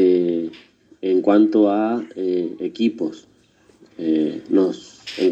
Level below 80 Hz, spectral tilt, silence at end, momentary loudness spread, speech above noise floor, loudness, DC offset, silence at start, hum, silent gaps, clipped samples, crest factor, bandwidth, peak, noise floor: -70 dBFS; -7 dB/octave; 0 s; 13 LU; 36 dB; -20 LUFS; under 0.1%; 0 s; none; none; under 0.1%; 16 dB; 8 kHz; -2 dBFS; -55 dBFS